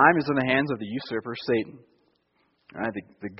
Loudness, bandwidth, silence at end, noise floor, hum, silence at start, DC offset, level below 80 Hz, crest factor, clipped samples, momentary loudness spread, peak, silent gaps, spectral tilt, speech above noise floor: -27 LUFS; 5.8 kHz; 0 s; -70 dBFS; none; 0 s; under 0.1%; -64 dBFS; 24 dB; under 0.1%; 13 LU; -4 dBFS; none; -4 dB/octave; 44 dB